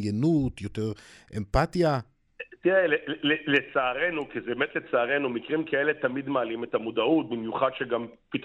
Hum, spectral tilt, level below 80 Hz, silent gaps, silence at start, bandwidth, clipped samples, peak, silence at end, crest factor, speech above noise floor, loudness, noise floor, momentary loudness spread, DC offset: none; -6.5 dB/octave; -48 dBFS; none; 0 s; 11.5 kHz; under 0.1%; -8 dBFS; 0 s; 18 dB; 19 dB; -27 LUFS; -46 dBFS; 9 LU; under 0.1%